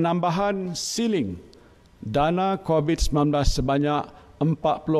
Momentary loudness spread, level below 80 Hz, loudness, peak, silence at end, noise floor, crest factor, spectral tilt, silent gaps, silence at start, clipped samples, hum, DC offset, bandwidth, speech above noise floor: 6 LU; -34 dBFS; -24 LUFS; -6 dBFS; 0 s; -52 dBFS; 16 dB; -5.5 dB/octave; none; 0 s; under 0.1%; none; under 0.1%; 13.5 kHz; 29 dB